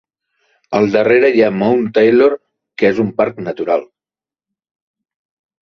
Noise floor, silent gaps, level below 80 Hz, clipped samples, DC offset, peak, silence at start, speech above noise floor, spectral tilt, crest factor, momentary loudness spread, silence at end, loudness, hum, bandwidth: under -90 dBFS; none; -58 dBFS; under 0.1%; under 0.1%; 0 dBFS; 0.7 s; over 77 dB; -7.5 dB/octave; 16 dB; 10 LU; 1.75 s; -14 LUFS; none; 6.4 kHz